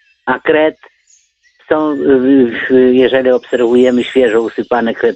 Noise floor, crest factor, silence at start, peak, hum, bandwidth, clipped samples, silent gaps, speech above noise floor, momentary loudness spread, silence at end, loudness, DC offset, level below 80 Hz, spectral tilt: -52 dBFS; 12 dB; 0.25 s; 0 dBFS; none; 8.4 kHz; under 0.1%; none; 42 dB; 7 LU; 0 s; -11 LUFS; under 0.1%; -50 dBFS; -6 dB/octave